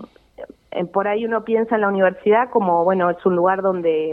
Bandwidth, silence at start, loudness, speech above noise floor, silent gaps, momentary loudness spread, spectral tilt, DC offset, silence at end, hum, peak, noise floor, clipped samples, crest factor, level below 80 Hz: 4.3 kHz; 0 s; -19 LUFS; 22 dB; none; 5 LU; -9 dB/octave; under 0.1%; 0 s; none; -4 dBFS; -40 dBFS; under 0.1%; 16 dB; -62 dBFS